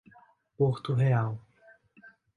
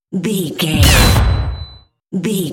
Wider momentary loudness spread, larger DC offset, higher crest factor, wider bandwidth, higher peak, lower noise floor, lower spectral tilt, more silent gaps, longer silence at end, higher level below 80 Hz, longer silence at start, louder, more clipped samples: second, 9 LU vs 16 LU; neither; about the same, 16 dB vs 14 dB; second, 4.7 kHz vs 17.5 kHz; second, -14 dBFS vs 0 dBFS; first, -60 dBFS vs -40 dBFS; first, -9 dB/octave vs -4.5 dB/octave; neither; first, 0.3 s vs 0 s; second, -64 dBFS vs -20 dBFS; first, 0.6 s vs 0.1 s; second, -28 LUFS vs -14 LUFS; neither